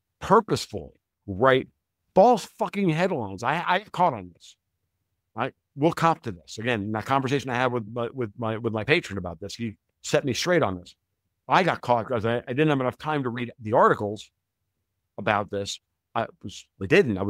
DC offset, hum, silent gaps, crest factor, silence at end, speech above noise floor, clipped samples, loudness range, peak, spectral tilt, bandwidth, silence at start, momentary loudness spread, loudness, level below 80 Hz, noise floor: under 0.1%; none; none; 22 dB; 0 s; 56 dB; under 0.1%; 4 LU; -2 dBFS; -5.5 dB/octave; 16 kHz; 0.2 s; 15 LU; -25 LUFS; -60 dBFS; -80 dBFS